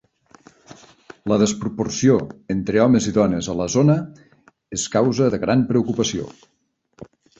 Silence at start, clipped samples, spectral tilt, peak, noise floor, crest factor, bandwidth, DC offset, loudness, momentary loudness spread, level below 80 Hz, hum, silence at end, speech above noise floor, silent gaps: 0.7 s; under 0.1%; -5.5 dB/octave; -4 dBFS; -51 dBFS; 18 dB; 8.2 kHz; under 0.1%; -20 LUFS; 10 LU; -50 dBFS; none; 0.35 s; 32 dB; none